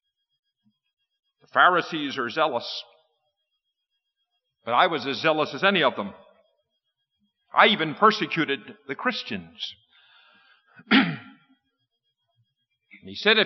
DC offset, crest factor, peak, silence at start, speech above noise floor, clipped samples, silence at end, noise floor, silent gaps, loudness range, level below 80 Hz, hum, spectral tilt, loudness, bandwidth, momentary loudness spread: under 0.1%; 22 dB; -4 dBFS; 1.55 s; 57 dB; under 0.1%; 0 s; -80 dBFS; none; 6 LU; -80 dBFS; none; -1.5 dB/octave; -23 LUFS; 6.2 kHz; 16 LU